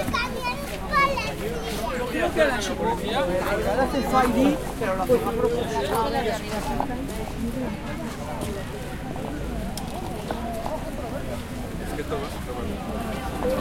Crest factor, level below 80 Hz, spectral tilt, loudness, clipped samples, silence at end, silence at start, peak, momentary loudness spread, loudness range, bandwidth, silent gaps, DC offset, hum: 20 dB; -38 dBFS; -5 dB/octave; -26 LUFS; under 0.1%; 0 s; 0 s; -6 dBFS; 10 LU; 8 LU; 16.5 kHz; none; under 0.1%; none